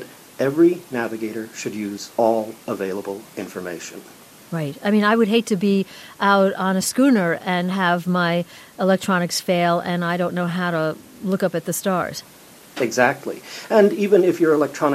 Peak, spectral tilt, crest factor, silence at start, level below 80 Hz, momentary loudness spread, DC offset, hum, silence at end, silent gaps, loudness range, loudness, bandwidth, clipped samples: -2 dBFS; -5 dB/octave; 18 dB; 0 s; -66 dBFS; 14 LU; under 0.1%; none; 0 s; none; 7 LU; -20 LUFS; 15.5 kHz; under 0.1%